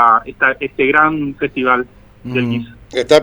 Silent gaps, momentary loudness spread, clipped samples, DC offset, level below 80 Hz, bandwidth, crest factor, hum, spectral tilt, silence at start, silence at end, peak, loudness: none; 12 LU; under 0.1%; under 0.1%; -46 dBFS; over 20 kHz; 16 dB; 50 Hz at -50 dBFS; -5.5 dB/octave; 0 s; 0 s; 0 dBFS; -15 LUFS